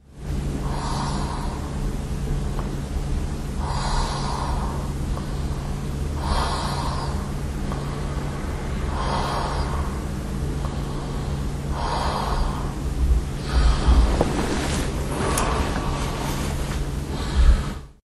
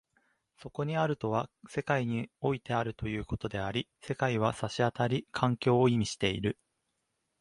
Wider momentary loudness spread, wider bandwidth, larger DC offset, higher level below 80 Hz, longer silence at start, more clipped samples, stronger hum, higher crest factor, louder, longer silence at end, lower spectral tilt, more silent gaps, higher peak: second, 7 LU vs 10 LU; first, 13 kHz vs 11.5 kHz; neither; first, -26 dBFS vs -56 dBFS; second, 0.1 s vs 0.65 s; neither; neither; about the same, 20 dB vs 22 dB; first, -26 LUFS vs -32 LUFS; second, 0.1 s vs 0.9 s; about the same, -5.5 dB/octave vs -6 dB/octave; neither; first, -4 dBFS vs -10 dBFS